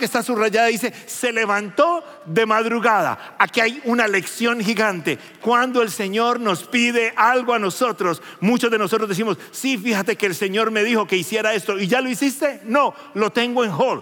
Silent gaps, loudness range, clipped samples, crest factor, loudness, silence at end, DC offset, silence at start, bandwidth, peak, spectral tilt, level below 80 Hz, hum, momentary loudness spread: none; 1 LU; under 0.1%; 18 dB; -19 LUFS; 0 s; under 0.1%; 0 s; 17 kHz; 0 dBFS; -4 dB/octave; -82 dBFS; none; 6 LU